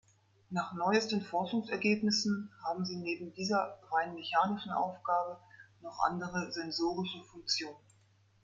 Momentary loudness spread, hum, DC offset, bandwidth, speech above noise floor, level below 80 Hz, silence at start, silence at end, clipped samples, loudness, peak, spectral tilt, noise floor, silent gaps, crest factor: 9 LU; none; under 0.1%; 7.8 kHz; 33 dB; -72 dBFS; 0.5 s; 0.65 s; under 0.1%; -34 LUFS; -14 dBFS; -4.5 dB/octave; -67 dBFS; none; 20 dB